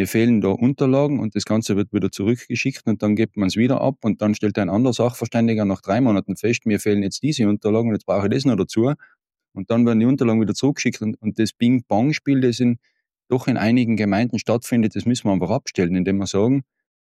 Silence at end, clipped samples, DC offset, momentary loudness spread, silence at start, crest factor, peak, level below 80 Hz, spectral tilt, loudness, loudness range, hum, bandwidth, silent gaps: 0.4 s; under 0.1%; under 0.1%; 5 LU; 0 s; 14 dB; -6 dBFS; -58 dBFS; -6.5 dB/octave; -20 LUFS; 1 LU; none; 14 kHz; none